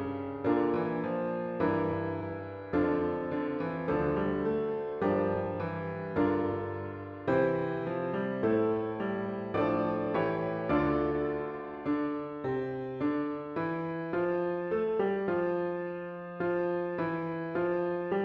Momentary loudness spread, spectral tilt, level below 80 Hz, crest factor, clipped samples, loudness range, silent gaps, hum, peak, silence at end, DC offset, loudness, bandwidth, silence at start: 7 LU; -10 dB/octave; -58 dBFS; 16 dB; under 0.1%; 2 LU; none; none; -14 dBFS; 0 s; under 0.1%; -32 LUFS; 5.6 kHz; 0 s